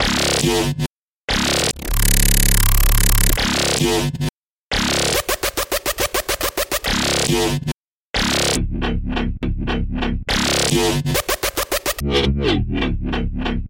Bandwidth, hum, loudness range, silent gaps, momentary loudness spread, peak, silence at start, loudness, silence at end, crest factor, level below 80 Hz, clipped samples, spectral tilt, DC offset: 17 kHz; none; 3 LU; 0.86-1.28 s, 4.30-4.70 s, 7.74-8.14 s; 8 LU; -2 dBFS; 0 s; -19 LUFS; 0 s; 16 dB; -24 dBFS; under 0.1%; -3.5 dB/octave; under 0.1%